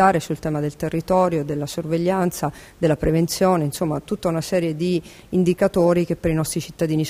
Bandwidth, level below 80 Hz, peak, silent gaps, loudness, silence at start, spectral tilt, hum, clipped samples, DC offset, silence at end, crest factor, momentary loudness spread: 16 kHz; -44 dBFS; -4 dBFS; none; -21 LUFS; 0 s; -6 dB/octave; none; under 0.1%; under 0.1%; 0 s; 18 dB; 7 LU